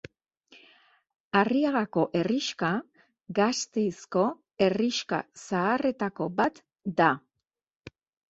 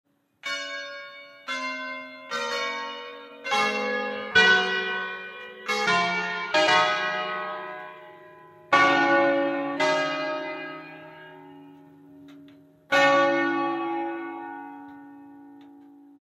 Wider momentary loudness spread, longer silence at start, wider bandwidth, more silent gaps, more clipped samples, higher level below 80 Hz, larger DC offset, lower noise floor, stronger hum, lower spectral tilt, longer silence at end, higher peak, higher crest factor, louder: second, 8 LU vs 21 LU; first, 1.35 s vs 0.45 s; second, 8.2 kHz vs 13.5 kHz; first, 7.76-7.80 s vs none; neither; about the same, -68 dBFS vs -70 dBFS; neither; first, -85 dBFS vs -52 dBFS; neither; first, -5 dB/octave vs -3 dB/octave; about the same, 0.4 s vs 0.35 s; about the same, -6 dBFS vs -6 dBFS; about the same, 22 dB vs 20 dB; second, -28 LUFS vs -24 LUFS